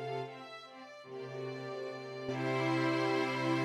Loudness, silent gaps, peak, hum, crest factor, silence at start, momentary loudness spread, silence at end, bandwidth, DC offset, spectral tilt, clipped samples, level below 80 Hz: -36 LUFS; none; -20 dBFS; none; 16 dB; 0 s; 16 LU; 0 s; 12 kHz; under 0.1%; -6 dB/octave; under 0.1%; -82 dBFS